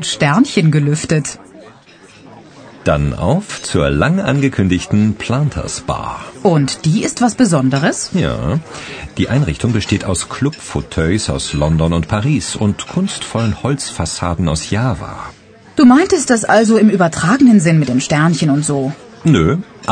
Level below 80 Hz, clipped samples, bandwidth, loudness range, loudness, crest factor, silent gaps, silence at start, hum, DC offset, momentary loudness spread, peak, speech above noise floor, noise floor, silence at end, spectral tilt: -34 dBFS; under 0.1%; 9.6 kHz; 6 LU; -14 LUFS; 14 dB; none; 0 s; none; under 0.1%; 10 LU; 0 dBFS; 28 dB; -42 dBFS; 0 s; -5.5 dB/octave